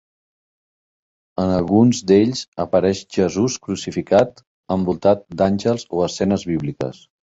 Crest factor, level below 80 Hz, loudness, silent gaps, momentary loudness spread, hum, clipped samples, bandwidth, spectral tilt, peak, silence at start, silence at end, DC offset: 18 dB; -46 dBFS; -19 LUFS; 2.48-2.52 s, 4.47-4.63 s; 10 LU; none; under 0.1%; 8 kHz; -6 dB/octave; -2 dBFS; 1.4 s; 0.3 s; under 0.1%